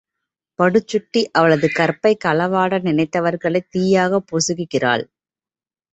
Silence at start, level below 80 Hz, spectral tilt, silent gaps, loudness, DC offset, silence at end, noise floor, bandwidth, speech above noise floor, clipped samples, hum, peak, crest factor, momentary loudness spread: 0.6 s; -60 dBFS; -5 dB/octave; none; -18 LUFS; under 0.1%; 0.9 s; under -90 dBFS; 8.2 kHz; over 73 dB; under 0.1%; none; -2 dBFS; 16 dB; 5 LU